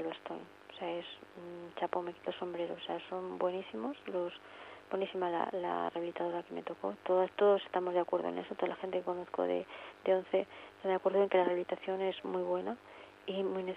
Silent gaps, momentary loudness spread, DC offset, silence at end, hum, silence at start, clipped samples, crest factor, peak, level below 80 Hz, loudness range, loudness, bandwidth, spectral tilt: none; 16 LU; under 0.1%; 0 s; none; 0 s; under 0.1%; 18 dB; -18 dBFS; -80 dBFS; 6 LU; -36 LUFS; 8 kHz; -7 dB/octave